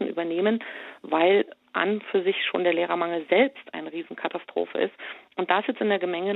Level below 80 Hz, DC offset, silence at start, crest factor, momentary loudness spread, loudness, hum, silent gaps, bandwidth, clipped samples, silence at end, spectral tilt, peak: -80 dBFS; under 0.1%; 0 s; 20 dB; 13 LU; -25 LUFS; none; none; 4.1 kHz; under 0.1%; 0 s; -7.5 dB/octave; -6 dBFS